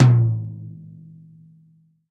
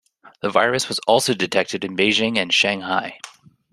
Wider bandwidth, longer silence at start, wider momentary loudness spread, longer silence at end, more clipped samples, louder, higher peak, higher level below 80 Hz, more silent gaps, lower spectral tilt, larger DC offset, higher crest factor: second, 5.2 kHz vs 14 kHz; second, 0 s vs 0.25 s; first, 26 LU vs 11 LU; first, 1.4 s vs 0.45 s; neither; about the same, -20 LUFS vs -19 LUFS; about the same, -2 dBFS vs -2 dBFS; first, -56 dBFS vs -62 dBFS; neither; first, -9 dB/octave vs -3 dB/octave; neither; about the same, 20 dB vs 20 dB